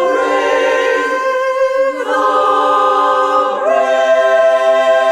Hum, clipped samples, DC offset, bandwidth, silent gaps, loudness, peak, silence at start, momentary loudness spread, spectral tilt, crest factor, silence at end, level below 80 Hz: none; under 0.1%; under 0.1%; 12 kHz; none; -12 LUFS; -2 dBFS; 0 s; 4 LU; -2 dB/octave; 12 dB; 0 s; -56 dBFS